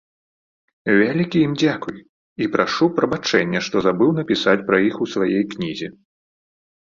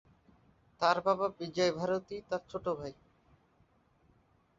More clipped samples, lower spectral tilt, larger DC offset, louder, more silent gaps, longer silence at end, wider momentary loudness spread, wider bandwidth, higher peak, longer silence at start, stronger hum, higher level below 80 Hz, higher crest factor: neither; first, -5.5 dB/octave vs -3.5 dB/octave; neither; first, -19 LUFS vs -33 LUFS; first, 2.09-2.36 s vs none; second, 0.9 s vs 1.65 s; about the same, 10 LU vs 9 LU; about the same, 7.4 kHz vs 7.6 kHz; first, -2 dBFS vs -12 dBFS; about the same, 0.85 s vs 0.8 s; neither; first, -58 dBFS vs -68 dBFS; second, 18 dB vs 24 dB